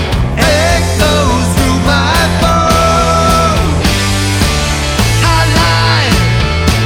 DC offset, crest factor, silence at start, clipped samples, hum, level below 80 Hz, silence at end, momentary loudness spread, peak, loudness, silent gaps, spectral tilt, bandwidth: under 0.1%; 10 dB; 0 s; under 0.1%; none; -18 dBFS; 0 s; 3 LU; 0 dBFS; -10 LUFS; none; -4.5 dB/octave; 17.5 kHz